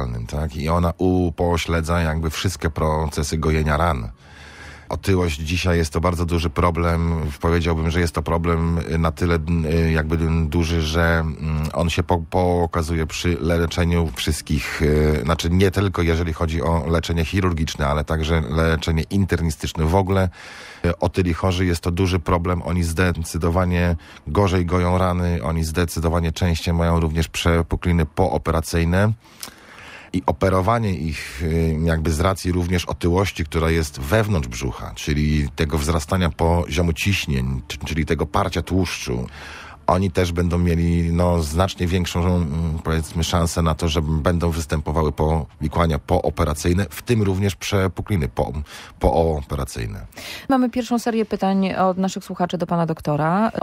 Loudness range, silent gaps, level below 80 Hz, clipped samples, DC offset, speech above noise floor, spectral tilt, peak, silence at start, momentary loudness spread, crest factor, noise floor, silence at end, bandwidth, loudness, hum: 2 LU; none; -30 dBFS; under 0.1%; under 0.1%; 21 dB; -6 dB/octave; -2 dBFS; 0 s; 6 LU; 20 dB; -41 dBFS; 0 s; 15.5 kHz; -21 LUFS; none